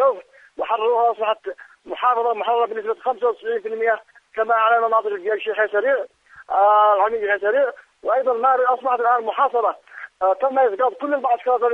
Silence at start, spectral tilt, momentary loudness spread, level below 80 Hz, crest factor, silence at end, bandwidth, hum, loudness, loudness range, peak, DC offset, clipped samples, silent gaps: 0 s; -4.5 dB/octave; 10 LU; -70 dBFS; 14 dB; 0 s; 4.3 kHz; none; -20 LUFS; 3 LU; -6 dBFS; under 0.1%; under 0.1%; none